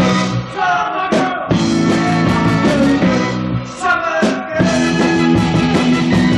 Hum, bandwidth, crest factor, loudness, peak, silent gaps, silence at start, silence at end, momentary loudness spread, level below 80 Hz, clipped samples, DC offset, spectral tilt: none; 11.5 kHz; 12 dB; -14 LUFS; -2 dBFS; none; 0 s; 0 s; 4 LU; -38 dBFS; under 0.1%; under 0.1%; -6 dB/octave